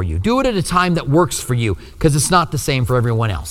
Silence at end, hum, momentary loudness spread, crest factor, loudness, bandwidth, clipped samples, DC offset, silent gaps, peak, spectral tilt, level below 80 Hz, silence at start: 0 s; none; 5 LU; 16 dB; -17 LUFS; 16.5 kHz; under 0.1%; under 0.1%; none; 0 dBFS; -5 dB/octave; -32 dBFS; 0 s